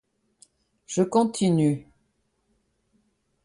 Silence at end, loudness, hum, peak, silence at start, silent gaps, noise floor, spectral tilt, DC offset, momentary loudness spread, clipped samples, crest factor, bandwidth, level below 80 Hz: 1.65 s; -24 LUFS; none; -10 dBFS; 0.9 s; none; -72 dBFS; -6.5 dB/octave; under 0.1%; 9 LU; under 0.1%; 18 dB; 11.5 kHz; -66 dBFS